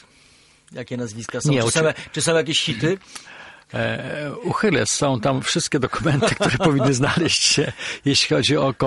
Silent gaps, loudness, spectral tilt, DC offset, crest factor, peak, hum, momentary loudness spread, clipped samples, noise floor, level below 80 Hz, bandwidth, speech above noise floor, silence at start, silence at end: none; -20 LUFS; -4 dB/octave; under 0.1%; 18 dB; -4 dBFS; none; 12 LU; under 0.1%; -53 dBFS; -50 dBFS; 11.5 kHz; 33 dB; 0.7 s; 0 s